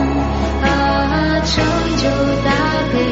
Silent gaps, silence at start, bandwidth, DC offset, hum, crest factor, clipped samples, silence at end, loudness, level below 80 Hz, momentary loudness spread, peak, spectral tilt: none; 0 s; 8 kHz; under 0.1%; none; 12 dB; under 0.1%; 0 s; -16 LUFS; -24 dBFS; 2 LU; -4 dBFS; -4.5 dB/octave